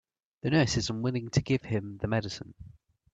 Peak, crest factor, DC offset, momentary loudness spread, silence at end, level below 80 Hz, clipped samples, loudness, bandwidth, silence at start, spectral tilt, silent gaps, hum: -12 dBFS; 20 dB; under 0.1%; 13 LU; 0.45 s; -54 dBFS; under 0.1%; -30 LUFS; 8.4 kHz; 0.45 s; -5.5 dB/octave; none; none